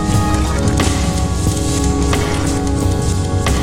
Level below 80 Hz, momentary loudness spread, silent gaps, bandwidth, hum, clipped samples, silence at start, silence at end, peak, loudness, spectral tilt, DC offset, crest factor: -20 dBFS; 2 LU; none; 16.5 kHz; none; under 0.1%; 0 s; 0 s; -2 dBFS; -16 LUFS; -5 dB/octave; under 0.1%; 14 dB